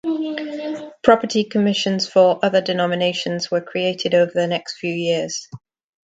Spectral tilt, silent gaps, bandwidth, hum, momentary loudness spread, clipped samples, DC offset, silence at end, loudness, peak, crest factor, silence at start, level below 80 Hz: -4.5 dB/octave; none; 9 kHz; none; 11 LU; under 0.1%; under 0.1%; 0.55 s; -19 LUFS; 0 dBFS; 20 dB; 0.05 s; -62 dBFS